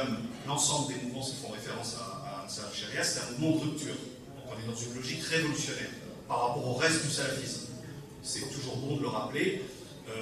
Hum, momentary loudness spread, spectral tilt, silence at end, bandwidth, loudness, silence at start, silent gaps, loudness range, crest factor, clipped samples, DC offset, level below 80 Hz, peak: none; 14 LU; -3.5 dB/octave; 0 s; 14.5 kHz; -33 LUFS; 0 s; none; 3 LU; 20 dB; under 0.1%; under 0.1%; -64 dBFS; -14 dBFS